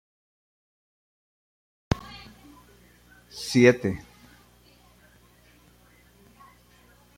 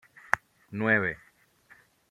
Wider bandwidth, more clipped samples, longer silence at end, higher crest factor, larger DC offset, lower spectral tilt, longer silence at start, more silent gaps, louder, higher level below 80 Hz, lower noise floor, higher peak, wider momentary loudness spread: about the same, 16 kHz vs 15 kHz; neither; first, 3.2 s vs 0.95 s; about the same, 26 dB vs 30 dB; neither; about the same, -5.5 dB/octave vs -6 dB/octave; first, 1.9 s vs 0.35 s; neither; first, -24 LUFS vs -28 LUFS; first, -52 dBFS vs -66 dBFS; about the same, -57 dBFS vs -60 dBFS; about the same, -4 dBFS vs -2 dBFS; first, 26 LU vs 16 LU